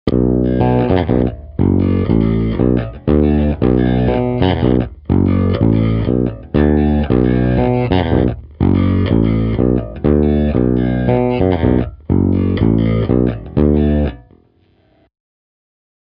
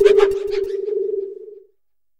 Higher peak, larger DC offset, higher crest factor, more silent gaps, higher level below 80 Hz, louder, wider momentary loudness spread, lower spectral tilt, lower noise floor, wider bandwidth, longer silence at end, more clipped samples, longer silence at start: about the same, 0 dBFS vs 0 dBFS; neither; about the same, 14 dB vs 18 dB; neither; first, -24 dBFS vs -48 dBFS; first, -15 LUFS vs -20 LUFS; second, 4 LU vs 21 LU; first, -11.5 dB/octave vs -4.5 dB/octave; second, -54 dBFS vs -71 dBFS; second, 5.4 kHz vs 9.2 kHz; first, 1.9 s vs 0.6 s; neither; about the same, 0.05 s vs 0 s